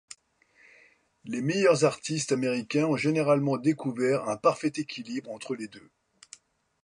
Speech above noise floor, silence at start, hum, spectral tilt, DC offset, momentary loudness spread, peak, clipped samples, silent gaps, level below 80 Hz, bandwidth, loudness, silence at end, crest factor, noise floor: 37 dB; 1.25 s; none; -5.5 dB/octave; under 0.1%; 13 LU; -10 dBFS; under 0.1%; none; -74 dBFS; 11.5 kHz; -27 LUFS; 1.05 s; 20 dB; -64 dBFS